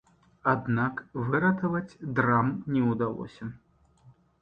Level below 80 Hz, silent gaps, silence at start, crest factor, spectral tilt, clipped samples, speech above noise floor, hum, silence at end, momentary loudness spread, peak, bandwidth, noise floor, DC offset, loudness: -60 dBFS; none; 0.45 s; 20 dB; -9.5 dB/octave; under 0.1%; 32 dB; none; 0.3 s; 12 LU; -10 dBFS; 6.8 kHz; -59 dBFS; under 0.1%; -28 LUFS